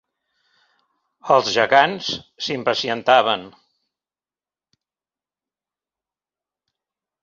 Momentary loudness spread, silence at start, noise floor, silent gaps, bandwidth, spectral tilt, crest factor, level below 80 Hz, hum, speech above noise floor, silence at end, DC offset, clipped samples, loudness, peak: 11 LU; 1.25 s; under -90 dBFS; none; 7.4 kHz; -3 dB/octave; 22 dB; -66 dBFS; none; over 71 dB; 3.75 s; under 0.1%; under 0.1%; -18 LUFS; -2 dBFS